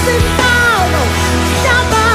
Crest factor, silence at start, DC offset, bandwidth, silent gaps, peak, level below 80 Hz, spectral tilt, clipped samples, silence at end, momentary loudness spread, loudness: 12 dB; 0 s; under 0.1%; 15.5 kHz; none; 0 dBFS; -22 dBFS; -4 dB/octave; under 0.1%; 0 s; 3 LU; -11 LUFS